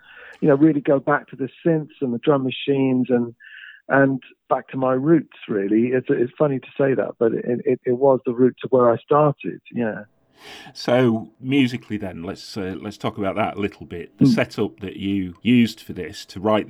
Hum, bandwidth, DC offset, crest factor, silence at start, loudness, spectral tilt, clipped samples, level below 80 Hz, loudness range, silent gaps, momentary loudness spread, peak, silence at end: none; 13 kHz; under 0.1%; 16 dB; 0.15 s; -21 LUFS; -7.5 dB/octave; under 0.1%; -62 dBFS; 4 LU; none; 13 LU; -4 dBFS; 0 s